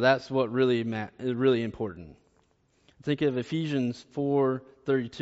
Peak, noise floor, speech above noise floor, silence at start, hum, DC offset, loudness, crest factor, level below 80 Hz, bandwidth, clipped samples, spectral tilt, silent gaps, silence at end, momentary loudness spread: -10 dBFS; -68 dBFS; 40 dB; 0 s; none; under 0.1%; -28 LUFS; 18 dB; -64 dBFS; 8 kHz; under 0.1%; -5.5 dB/octave; none; 0 s; 9 LU